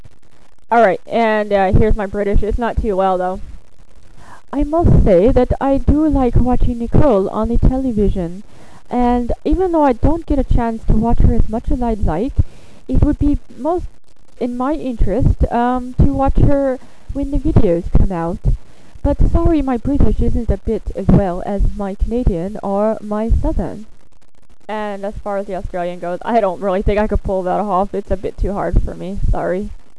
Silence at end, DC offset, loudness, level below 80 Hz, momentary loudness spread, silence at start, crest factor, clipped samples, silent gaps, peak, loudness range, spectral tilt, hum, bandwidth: 0.2 s; 3%; -17 LUFS; -20 dBFS; 10 LU; 0.7 s; 14 dB; under 0.1%; none; 0 dBFS; 5 LU; -9 dB/octave; none; 11 kHz